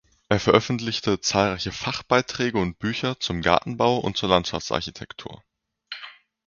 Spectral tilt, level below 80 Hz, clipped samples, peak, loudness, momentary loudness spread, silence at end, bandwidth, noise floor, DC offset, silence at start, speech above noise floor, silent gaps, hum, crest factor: -4.5 dB/octave; -48 dBFS; under 0.1%; -2 dBFS; -23 LUFS; 17 LU; 0.35 s; 7.4 kHz; -44 dBFS; under 0.1%; 0.3 s; 21 dB; none; none; 22 dB